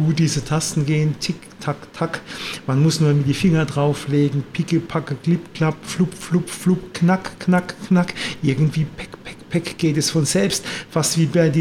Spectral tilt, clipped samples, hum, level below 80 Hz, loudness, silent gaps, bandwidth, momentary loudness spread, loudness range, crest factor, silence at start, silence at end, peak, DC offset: -5.5 dB/octave; under 0.1%; none; -50 dBFS; -20 LUFS; none; 15.5 kHz; 9 LU; 2 LU; 16 dB; 0 s; 0 s; -4 dBFS; under 0.1%